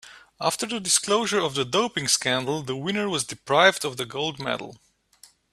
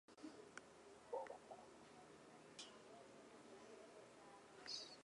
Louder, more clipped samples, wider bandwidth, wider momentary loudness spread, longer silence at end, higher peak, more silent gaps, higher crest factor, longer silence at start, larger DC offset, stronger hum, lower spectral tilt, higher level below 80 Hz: first, -24 LUFS vs -58 LUFS; neither; first, 14.5 kHz vs 11 kHz; about the same, 10 LU vs 12 LU; first, 0.8 s vs 0 s; first, -2 dBFS vs -38 dBFS; neither; about the same, 24 dB vs 22 dB; about the same, 0.05 s vs 0.1 s; neither; neither; about the same, -2.5 dB/octave vs -2.5 dB/octave; first, -64 dBFS vs -88 dBFS